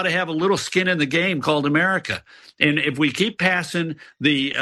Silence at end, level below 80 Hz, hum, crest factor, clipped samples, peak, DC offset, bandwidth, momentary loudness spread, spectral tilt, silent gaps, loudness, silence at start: 0 s; -60 dBFS; none; 20 dB; under 0.1%; 0 dBFS; under 0.1%; 12.5 kHz; 7 LU; -4.5 dB/octave; none; -20 LUFS; 0 s